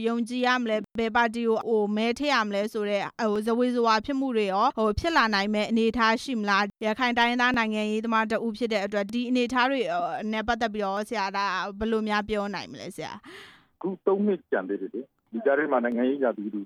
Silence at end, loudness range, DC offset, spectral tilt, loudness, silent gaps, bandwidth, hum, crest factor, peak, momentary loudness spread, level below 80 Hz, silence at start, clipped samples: 0 s; 5 LU; under 0.1%; -5 dB/octave; -26 LUFS; none; 13.5 kHz; none; 16 dB; -10 dBFS; 7 LU; -52 dBFS; 0 s; under 0.1%